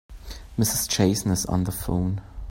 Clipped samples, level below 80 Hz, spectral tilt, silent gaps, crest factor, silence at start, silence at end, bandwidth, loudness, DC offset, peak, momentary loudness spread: under 0.1%; -40 dBFS; -4.5 dB/octave; none; 18 dB; 0.1 s; 0 s; 16.5 kHz; -24 LUFS; under 0.1%; -6 dBFS; 12 LU